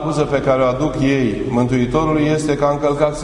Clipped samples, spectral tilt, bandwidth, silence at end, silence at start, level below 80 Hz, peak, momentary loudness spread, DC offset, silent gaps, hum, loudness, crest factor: under 0.1%; -6.5 dB/octave; 11 kHz; 0 s; 0 s; -36 dBFS; -2 dBFS; 2 LU; under 0.1%; none; none; -17 LUFS; 16 dB